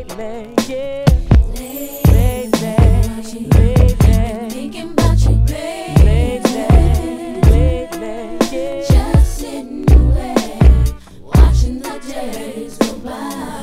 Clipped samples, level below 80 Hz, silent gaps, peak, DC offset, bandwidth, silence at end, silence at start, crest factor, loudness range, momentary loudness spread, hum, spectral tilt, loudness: 0.3%; -16 dBFS; none; 0 dBFS; under 0.1%; 15.5 kHz; 0 s; 0 s; 12 dB; 2 LU; 14 LU; none; -7 dB/octave; -15 LUFS